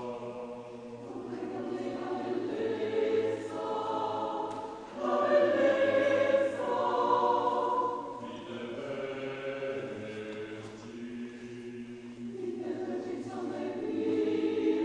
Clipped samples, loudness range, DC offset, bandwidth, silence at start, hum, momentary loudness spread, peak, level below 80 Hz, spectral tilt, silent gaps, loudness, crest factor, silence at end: under 0.1%; 12 LU; under 0.1%; 10 kHz; 0 s; none; 16 LU; -14 dBFS; -70 dBFS; -6 dB/octave; none; -32 LUFS; 18 dB; 0 s